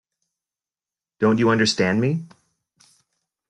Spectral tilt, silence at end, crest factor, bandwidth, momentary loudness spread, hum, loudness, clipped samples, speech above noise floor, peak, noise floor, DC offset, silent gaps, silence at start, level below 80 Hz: -5 dB/octave; 1.25 s; 18 dB; 11 kHz; 7 LU; none; -20 LUFS; under 0.1%; over 71 dB; -6 dBFS; under -90 dBFS; under 0.1%; none; 1.2 s; -62 dBFS